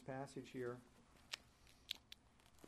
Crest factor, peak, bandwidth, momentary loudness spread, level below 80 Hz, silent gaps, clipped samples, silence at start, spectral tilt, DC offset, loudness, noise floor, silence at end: 32 dB; -22 dBFS; 13 kHz; 19 LU; -76 dBFS; none; under 0.1%; 0 s; -4 dB/octave; under 0.1%; -52 LUFS; -70 dBFS; 0 s